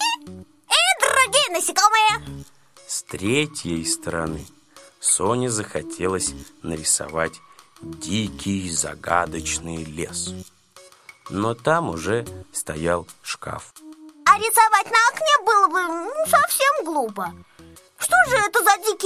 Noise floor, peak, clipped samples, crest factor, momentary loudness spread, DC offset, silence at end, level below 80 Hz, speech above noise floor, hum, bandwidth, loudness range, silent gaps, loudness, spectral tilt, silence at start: -50 dBFS; -2 dBFS; under 0.1%; 20 dB; 15 LU; under 0.1%; 0 s; -48 dBFS; 28 dB; none; 16 kHz; 8 LU; none; -20 LUFS; -2.5 dB/octave; 0 s